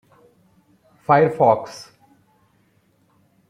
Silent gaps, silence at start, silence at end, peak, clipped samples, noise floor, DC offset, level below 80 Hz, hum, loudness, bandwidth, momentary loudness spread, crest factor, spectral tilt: none; 1.1 s; 1.65 s; -2 dBFS; under 0.1%; -61 dBFS; under 0.1%; -64 dBFS; none; -17 LUFS; 12.5 kHz; 21 LU; 20 dB; -7 dB/octave